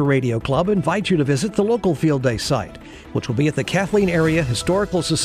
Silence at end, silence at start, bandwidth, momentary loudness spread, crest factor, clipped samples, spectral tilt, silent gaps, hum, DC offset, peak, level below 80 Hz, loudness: 0 s; 0 s; 15 kHz; 6 LU; 14 dB; under 0.1%; -5.5 dB/octave; none; none; under 0.1%; -4 dBFS; -42 dBFS; -20 LUFS